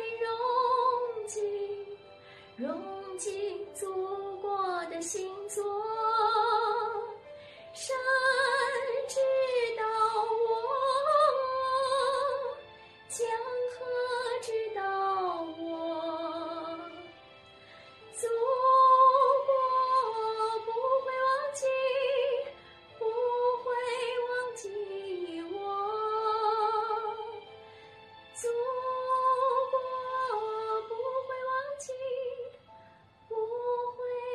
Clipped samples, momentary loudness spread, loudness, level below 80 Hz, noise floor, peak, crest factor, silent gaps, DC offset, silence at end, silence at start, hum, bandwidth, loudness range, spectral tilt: under 0.1%; 13 LU; -30 LUFS; -76 dBFS; -58 dBFS; -12 dBFS; 18 dB; none; under 0.1%; 0 s; 0 s; none; 12 kHz; 10 LU; -2 dB/octave